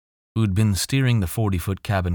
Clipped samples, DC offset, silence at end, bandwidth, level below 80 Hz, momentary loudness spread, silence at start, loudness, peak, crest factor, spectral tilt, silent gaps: under 0.1%; under 0.1%; 0 s; over 20 kHz; -40 dBFS; 5 LU; 0.35 s; -22 LUFS; -8 dBFS; 14 dB; -5.5 dB/octave; none